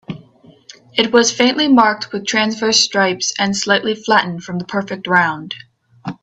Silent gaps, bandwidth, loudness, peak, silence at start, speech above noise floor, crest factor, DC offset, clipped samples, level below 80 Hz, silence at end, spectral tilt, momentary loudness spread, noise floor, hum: none; 8.4 kHz; -15 LUFS; 0 dBFS; 0.1 s; 30 dB; 16 dB; under 0.1%; under 0.1%; -60 dBFS; 0.1 s; -3 dB/octave; 17 LU; -46 dBFS; none